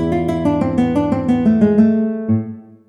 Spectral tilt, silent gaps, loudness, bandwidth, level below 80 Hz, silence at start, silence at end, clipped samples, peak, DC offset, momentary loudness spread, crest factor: -9 dB/octave; none; -16 LUFS; 7.8 kHz; -40 dBFS; 0 s; 0.25 s; under 0.1%; -2 dBFS; under 0.1%; 7 LU; 14 dB